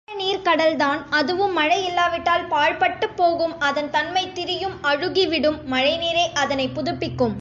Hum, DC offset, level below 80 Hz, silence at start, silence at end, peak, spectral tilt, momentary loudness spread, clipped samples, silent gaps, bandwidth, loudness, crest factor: none; under 0.1%; -50 dBFS; 0.1 s; 0 s; -6 dBFS; -4 dB/octave; 5 LU; under 0.1%; none; 7.8 kHz; -21 LUFS; 14 dB